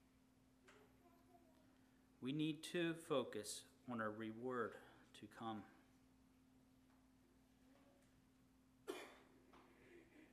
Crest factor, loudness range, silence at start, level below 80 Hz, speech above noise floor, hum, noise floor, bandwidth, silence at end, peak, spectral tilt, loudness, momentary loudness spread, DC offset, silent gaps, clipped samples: 24 dB; 16 LU; 0.65 s; -84 dBFS; 27 dB; none; -74 dBFS; 15 kHz; 0.05 s; -28 dBFS; -4.5 dB/octave; -48 LUFS; 23 LU; under 0.1%; none; under 0.1%